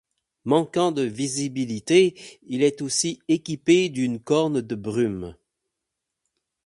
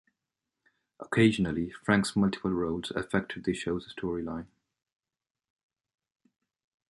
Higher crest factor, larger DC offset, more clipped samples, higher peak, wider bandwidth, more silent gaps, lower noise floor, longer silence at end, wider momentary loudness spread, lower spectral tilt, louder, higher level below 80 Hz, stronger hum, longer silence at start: about the same, 20 dB vs 22 dB; neither; neither; first, -4 dBFS vs -10 dBFS; about the same, 11.5 kHz vs 11.5 kHz; neither; second, -83 dBFS vs under -90 dBFS; second, 1.35 s vs 2.45 s; about the same, 10 LU vs 10 LU; second, -4.5 dB/octave vs -6 dB/octave; first, -23 LUFS vs -30 LUFS; about the same, -60 dBFS vs -56 dBFS; neither; second, 0.45 s vs 1 s